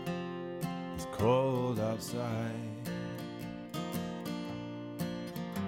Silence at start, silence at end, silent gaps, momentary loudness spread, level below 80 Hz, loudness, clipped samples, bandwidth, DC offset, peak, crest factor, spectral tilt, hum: 0 s; 0 s; none; 11 LU; -62 dBFS; -36 LUFS; under 0.1%; 16.5 kHz; under 0.1%; -16 dBFS; 20 dB; -6.5 dB/octave; none